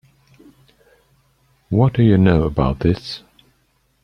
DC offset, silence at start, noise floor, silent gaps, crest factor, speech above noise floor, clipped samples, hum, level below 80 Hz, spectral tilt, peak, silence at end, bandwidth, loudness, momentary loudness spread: under 0.1%; 1.7 s; -63 dBFS; none; 18 dB; 47 dB; under 0.1%; none; -36 dBFS; -9 dB/octave; -2 dBFS; 0.85 s; 9.6 kHz; -17 LUFS; 13 LU